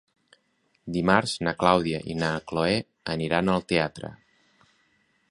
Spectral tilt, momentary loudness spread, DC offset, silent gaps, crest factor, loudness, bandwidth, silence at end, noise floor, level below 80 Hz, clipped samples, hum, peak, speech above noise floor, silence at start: -5.5 dB/octave; 11 LU; under 0.1%; none; 24 dB; -25 LUFS; 11.5 kHz; 1.15 s; -70 dBFS; -54 dBFS; under 0.1%; none; -2 dBFS; 45 dB; 0.85 s